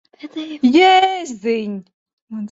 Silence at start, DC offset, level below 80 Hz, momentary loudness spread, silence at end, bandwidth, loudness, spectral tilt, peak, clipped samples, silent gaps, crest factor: 0.25 s; under 0.1%; -64 dBFS; 21 LU; 0.05 s; 8 kHz; -15 LUFS; -4 dB/octave; -2 dBFS; under 0.1%; 1.94-2.06 s, 2.13-2.27 s; 16 dB